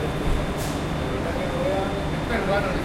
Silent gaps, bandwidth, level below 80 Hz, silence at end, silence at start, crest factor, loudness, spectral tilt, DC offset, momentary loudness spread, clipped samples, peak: none; 16.5 kHz; -32 dBFS; 0 s; 0 s; 14 dB; -25 LUFS; -6 dB/octave; under 0.1%; 4 LU; under 0.1%; -12 dBFS